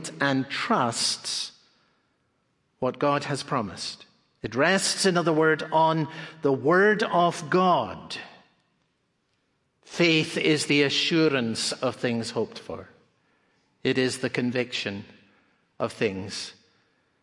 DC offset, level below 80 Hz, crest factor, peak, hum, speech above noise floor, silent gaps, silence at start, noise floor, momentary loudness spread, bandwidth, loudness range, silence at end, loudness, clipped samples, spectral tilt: under 0.1%; -70 dBFS; 20 dB; -6 dBFS; none; 48 dB; none; 0 s; -73 dBFS; 14 LU; 11.5 kHz; 7 LU; 0.7 s; -25 LUFS; under 0.1%; -4 dB/octave